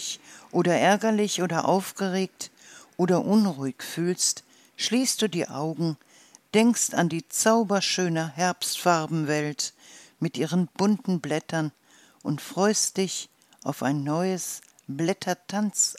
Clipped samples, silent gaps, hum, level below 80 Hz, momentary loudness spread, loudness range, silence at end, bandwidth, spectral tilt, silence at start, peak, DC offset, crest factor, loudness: under 0.1%; none; none; -78 dBFS; 12 LU; 4 LU; 0 s; 16 kHz; -4 dB/octave; 0 s; -6 dBFS; under 0.1%; 20 dB; -25 LUFS